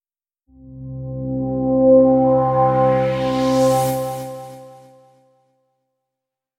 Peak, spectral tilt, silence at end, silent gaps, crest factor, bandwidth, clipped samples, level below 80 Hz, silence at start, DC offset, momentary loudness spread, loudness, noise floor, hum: -2 dBFS; -7 dB/octave; 1.85 s; none; 16 dB; 16.5 kHz; under 0.1%; -46 dBFS; 0.65 s; under 0.1%; 20 LU; -17 LUFS; -83 dBFS; none